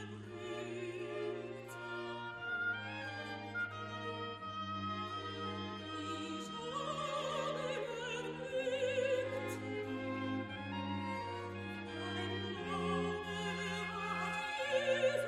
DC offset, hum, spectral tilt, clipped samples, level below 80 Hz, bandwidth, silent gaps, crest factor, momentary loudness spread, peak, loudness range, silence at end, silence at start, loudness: under 0.1%; none; -5 dB/octave; under 0.1%; -70 dBFS; 13 kHz; none; 18 dB; 7 LU; -22 dBFS; 3 LU; 0 s; 0 s; -40 LUFS